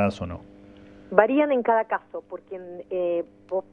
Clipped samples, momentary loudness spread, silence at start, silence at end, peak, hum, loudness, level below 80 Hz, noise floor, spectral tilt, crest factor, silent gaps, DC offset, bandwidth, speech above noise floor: under 0.1%; 18 LU; 0 s; 0.1 s; 0 dBFS; none; -24 LUFS; -56 dBFS; -48 dBFS; -7.5 dB/octave; 24 dB; none; under 0.1%; 9 kHz; 23 dB